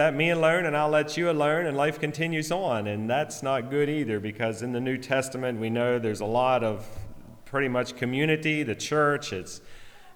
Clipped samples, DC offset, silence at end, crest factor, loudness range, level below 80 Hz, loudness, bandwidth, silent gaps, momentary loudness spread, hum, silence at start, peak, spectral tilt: under 0.1%; under 0.1%; 0 s; 16 dB; 3 LU; -56 dBFS; -26 LUFS; 19.5 kHz; none; 8 LU; none; 0 s; -10 dBFS; -5.5 dB/octave